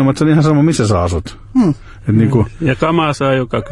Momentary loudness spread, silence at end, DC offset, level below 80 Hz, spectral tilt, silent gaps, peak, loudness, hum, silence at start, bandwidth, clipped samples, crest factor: 7 LU; 0 s; under 0.1%; -36 dBFS; -7 dB/octave; none; -2 dBFS; -14 LUFS; none; 0 s; 11.5 kHz; under 0.1%; 12 dB